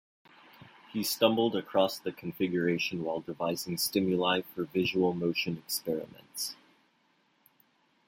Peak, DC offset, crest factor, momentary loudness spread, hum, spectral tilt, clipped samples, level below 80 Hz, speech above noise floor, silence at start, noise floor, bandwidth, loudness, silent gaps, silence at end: -10 dBFS; under 0.1%; 22 dB; 10 LU; none; -4.5 dB/octave; under 0.1%; -72 dBFS; 40 dB; 0.6 s; -70 dBFS; 16.5 kHz; -31 LUFS; none; 1.55 s